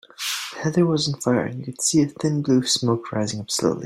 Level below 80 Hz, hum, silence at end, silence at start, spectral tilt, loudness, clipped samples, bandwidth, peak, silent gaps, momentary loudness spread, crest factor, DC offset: -60 dBFS; none; 0 s; 0.2 s; -4.5 dB/octave; -22 LUFS; under 0.1%; 16 kHz; -6 dBFS; none; 7 LU; 16 dB; under 0.1%